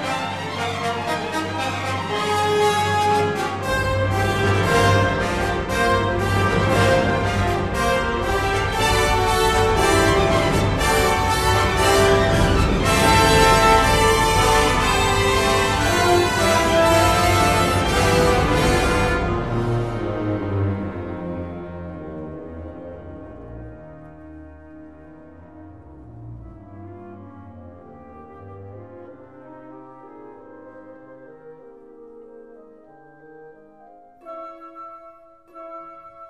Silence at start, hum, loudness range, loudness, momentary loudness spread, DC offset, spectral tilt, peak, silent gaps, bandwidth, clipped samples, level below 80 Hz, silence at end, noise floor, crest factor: 0 s; none; 17 LU; -18 LUFS; 22 LU; 0.3%; -4.5 dB/octave; -2 dBFS; none; 14 kHz; under 0.1%; -32 dBFS; 0 s; -48 dBFS; 18 dB